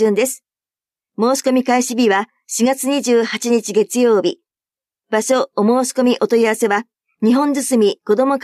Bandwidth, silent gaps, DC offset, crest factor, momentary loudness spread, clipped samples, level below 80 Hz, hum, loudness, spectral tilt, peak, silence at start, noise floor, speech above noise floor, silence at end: 15.5 kHz; none; under 0.1%; 14 dB; 6 LU; under 0.1%; -70 dBFS; none; -16 LUFS; -4 dB/octave; -4 dBFS; 0 s; under -90 dBFS; over 75 dB; 0 s